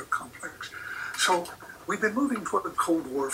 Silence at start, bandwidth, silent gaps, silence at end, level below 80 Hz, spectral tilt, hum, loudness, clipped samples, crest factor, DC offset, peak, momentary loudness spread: 0 s; 16 kHz; none; 0 s; -64 dBFS; -2.5 dB/octave; none; -29 LUFS; under 0.1%; 18 dB; under 0.1%; -12 dBFS; 14 LU